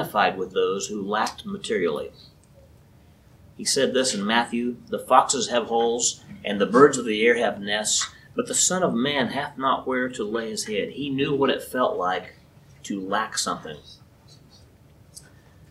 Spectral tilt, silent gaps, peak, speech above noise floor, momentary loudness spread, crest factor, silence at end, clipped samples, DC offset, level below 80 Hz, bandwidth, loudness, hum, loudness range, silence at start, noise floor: -2.5 dB/octave; none; -2 dBFS; 29 dB; 12 LU; 24 dB; 0.5 s; under 0.1%; under 0.1%; -60 dBFS; 16 kHz; -23 LUFS; none; 8 LU; 0 s; -53 dBFS